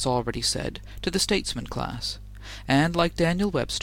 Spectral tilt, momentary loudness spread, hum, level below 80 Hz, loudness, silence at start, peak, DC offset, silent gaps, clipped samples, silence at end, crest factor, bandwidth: -4 dB/octave; 11 LU; none; -40 dBFS; -26 LUFS; 0 s; -8 dBFS; under 0.1%; none; under 0.1%; 0 s; 18 dB; 17 kHz